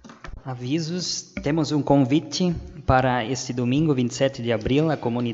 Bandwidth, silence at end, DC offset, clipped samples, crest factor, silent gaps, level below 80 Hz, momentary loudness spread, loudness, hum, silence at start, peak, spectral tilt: 8 kHz; 0 s; under 0.1%; under 0.1%; 20 dB; none; -44 dBFS; 8 LU; -23 LUFS; none; 0.05 s; -2 dBFS; -5.5 dB/octave